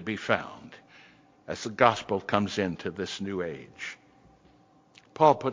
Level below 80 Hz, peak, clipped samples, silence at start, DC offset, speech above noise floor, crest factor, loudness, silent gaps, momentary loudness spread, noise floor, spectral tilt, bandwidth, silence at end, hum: -60 dBFS; -4 dBFS; under 0.1%; 0 s; under 0.1%; 33 dB; 26 dB; -28 LUFS; none; 21 LU; -60 dBFS; -5 dB/octave; 7.6 kHz; 0 s; none